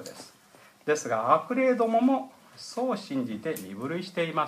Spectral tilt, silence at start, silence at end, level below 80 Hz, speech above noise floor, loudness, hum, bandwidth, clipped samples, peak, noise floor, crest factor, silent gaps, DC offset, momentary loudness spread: -5 dB/octave; 0 s; 0 s; -76 dBFS; 29 dB; -28 LUFS; none; 15.5 kHz; under 0.1%; -8 dBFS; -56 dBFS; 20 dB; none; under 0.1%; 16 LU